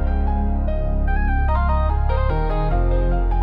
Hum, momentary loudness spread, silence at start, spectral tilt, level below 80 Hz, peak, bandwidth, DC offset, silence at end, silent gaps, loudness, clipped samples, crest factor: none; 3 LU; 0 s; -10.5 dB/octave; -18 dBFS; -8 dBFS; 4.5 kHz; under 0.1%; 0 s; none; -22 LUFS; under 0.1%; 10 dB